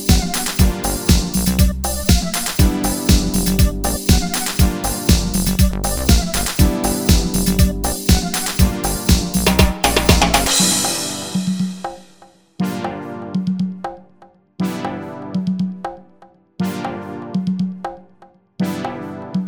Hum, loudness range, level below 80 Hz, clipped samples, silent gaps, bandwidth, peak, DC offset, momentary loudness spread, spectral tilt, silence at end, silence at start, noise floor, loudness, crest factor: none; 10 LU; -22 dBFS; under 0.1%; none; over 20 kHz; 0 dBFS; 0.2%; 11 LU; -4 dB/octave; 0 s; 0 s; -49 dBFS; -18 LUFS; 18 dB